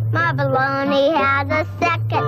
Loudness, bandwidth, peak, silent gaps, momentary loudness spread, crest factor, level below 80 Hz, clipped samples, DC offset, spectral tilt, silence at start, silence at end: -18 LUFS; 12.5 kHz; -8 dBFS; none; 4 LU; 10 dB; -50 dBFS; under 0.1%; under 0.1%; -7 dB/octave; 0 s; 0 s